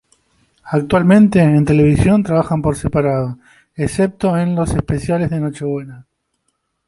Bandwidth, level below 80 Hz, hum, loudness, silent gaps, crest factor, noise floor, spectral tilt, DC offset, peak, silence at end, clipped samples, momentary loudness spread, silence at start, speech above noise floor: 11.5 kHz; -36 dBFS; none; -15 LUFS; none; 14 dB; -69 dBFS; -8 dB/octave; under 0.1%; -2 dBFS; 0.85 s; under 0.1%; 13 LU; 0.65 s; 54 dB